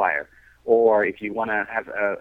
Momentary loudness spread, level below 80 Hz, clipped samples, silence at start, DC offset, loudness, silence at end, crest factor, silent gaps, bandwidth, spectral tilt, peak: 13 LU; -60 dBFS; under 0.1%; 0 s; under 0.1%; -22 LUFS; 0 s; 16 dB; none; 3.9 kHz; -7.5 dB/octave; -6 dBFS